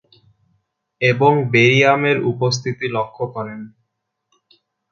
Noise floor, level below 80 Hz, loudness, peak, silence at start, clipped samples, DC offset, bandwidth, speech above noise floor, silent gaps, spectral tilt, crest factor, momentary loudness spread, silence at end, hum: -75 dBFS; -60 dBFS; -16 LUFS; 0 dBFS; 1 s; under 0.1%; under 0.1%; 7.4 kHz; 59 dB; none; -5.5 dB/octave; 18 dB; 14 LU; 1.25 s; none